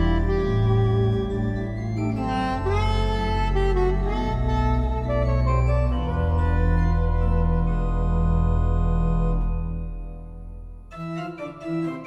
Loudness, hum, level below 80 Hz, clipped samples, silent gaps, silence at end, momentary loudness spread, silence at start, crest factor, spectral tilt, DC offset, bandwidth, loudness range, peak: -24 LUFS; none; -24 dBFS; under 0.1%; none; 0 s; 12 LU; 0 s; 14 dB; -8.5 dB/octave; under 0.1%; 7.4 kHz; 3 LU; -8 dBFS